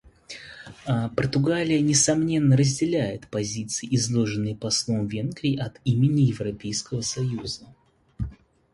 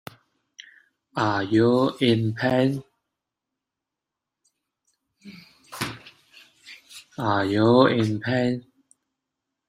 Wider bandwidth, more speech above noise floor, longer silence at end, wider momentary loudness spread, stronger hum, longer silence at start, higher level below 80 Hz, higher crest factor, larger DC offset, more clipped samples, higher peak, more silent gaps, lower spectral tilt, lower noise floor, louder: second, 11.5 kHz vs 15.5 kHz; second, 20 dB vs 65 dB; second, 0.4 s vs 1.1 s; second, 16 LU vs 23 LU; neither; second, 0.3 s vs 1.15 s; first, -50 dBFS vs -62 dBFS; about the same, 16 dB vs 20 dB; neither; neither; about the same, -8 dBFS vs -6 dBFS; neither; second, -5 dB/octave vs -6.5 dB/octave; second, -44 dBFS vs -86 dBFS; about the same, -24 LUFS vs -22 LUFS